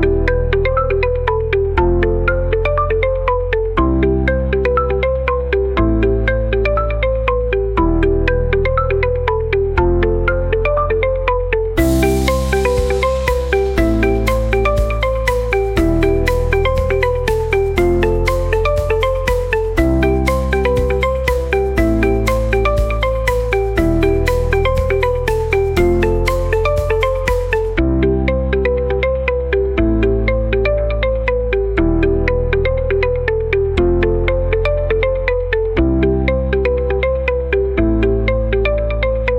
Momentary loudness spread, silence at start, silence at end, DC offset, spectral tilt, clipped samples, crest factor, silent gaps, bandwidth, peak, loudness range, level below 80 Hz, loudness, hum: 3 LU; 0 s; 0 s; 0.2%; -7 dB/octave; under 0.1%; 14 dB; none; 16.5 kHz; -2 dBFS; 1 LU; -20 dBFS; -16 LUFS; none